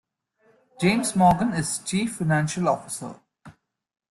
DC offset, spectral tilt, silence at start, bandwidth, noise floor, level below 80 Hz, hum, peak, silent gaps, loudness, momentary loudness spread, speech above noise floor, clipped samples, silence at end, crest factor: under 0.1%; -5 dB/octave; 0.8 s; 12.5 kHz; -64 dBFS; -54 dBFS; none; -6 dBFS; none; -23 LUFS; 12 LU; 41 dB; under 0.1%; 0.6 s; 20 dB